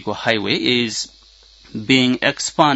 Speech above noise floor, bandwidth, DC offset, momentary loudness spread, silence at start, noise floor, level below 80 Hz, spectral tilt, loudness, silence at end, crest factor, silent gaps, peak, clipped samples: 30 dB; 8 kHz; under 0.1%; 15 LU; 0 s; -48 dBFS; -54 dBFS; -3.5 dB/octave; -17 LUFS; 0 s; 18 dB; none; 0 dBFS; under 0.1%